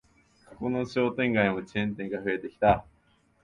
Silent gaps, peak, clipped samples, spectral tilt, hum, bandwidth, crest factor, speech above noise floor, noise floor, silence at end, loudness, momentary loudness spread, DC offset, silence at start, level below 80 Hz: none; -8 dBFS; under 0.1%; -7.5 dB/octave; none; 9.8 kHz; 22 dB; 38 dB; -66 dBFS; 0.65 s; -28 LUFS; 7 LU; under 0.1%; 0.5 s; -52 dBFS